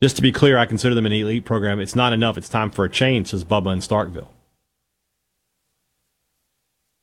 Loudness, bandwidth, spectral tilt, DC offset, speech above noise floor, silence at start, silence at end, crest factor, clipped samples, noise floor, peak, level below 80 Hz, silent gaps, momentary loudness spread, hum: -19 LUFS; 15 kHz; -5.5 dB/octave; under 0.1%; 57 dB; 0 s; 2.75 s; 18 dB; under 0.1%; -75 dBFS; -2 dBFS; -48 dBFS; none; 7 LU; none